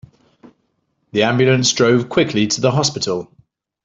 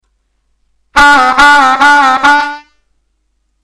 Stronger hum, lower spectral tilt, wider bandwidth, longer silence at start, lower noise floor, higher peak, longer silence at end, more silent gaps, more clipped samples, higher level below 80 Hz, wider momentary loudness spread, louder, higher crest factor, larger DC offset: neither; first, -4.5 dB/octave vs -1.5 dB/octave; second, 8 kHz vs 14 kHz; first, 1.15 s vs 0.95 s; first, -67 dBFS vs -61 dBFS; about the same, -2 dBFS vs 0 dBFS; second, 0.6 s vs 1.05 s; neither; neither; second, -54 dBFS vs -36 dBFS; about the same, 9 LU vs 10 LU; second, -16 LUFS vs -6 LUFS; first, 16 dB vs 10 dB; neither